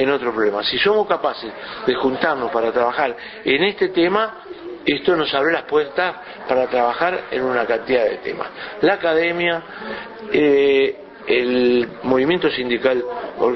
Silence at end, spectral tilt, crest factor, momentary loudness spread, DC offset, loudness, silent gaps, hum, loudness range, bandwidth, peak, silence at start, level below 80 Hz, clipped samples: 0 s; -7 dB/octave; 18 dB; 11 LU; under 0.1%; -19 LUFS; none; none; 2 LU; 6 kHz; -2 dBFS; 0 s; -54 dBFS; under 0.1%